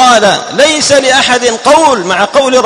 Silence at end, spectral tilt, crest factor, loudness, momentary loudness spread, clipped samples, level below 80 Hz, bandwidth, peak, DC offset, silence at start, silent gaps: 0 s; -2 dB/octave; 8 dB; -7 LUFS; 3 LU; 2%; -44 dBFS; 14 kHz; 0 dBFS; under 0.1%; 0 s; none